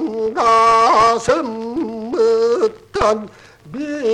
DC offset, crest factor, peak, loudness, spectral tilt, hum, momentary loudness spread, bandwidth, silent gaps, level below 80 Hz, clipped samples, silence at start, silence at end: under 0.1%; 14 dB; -2 dBFS; -16 LUFS; -4 dB/octave; none; 13 LU; 10.5 kHz; none; -44 dBFS; under 0.1%; 0 s; 0 s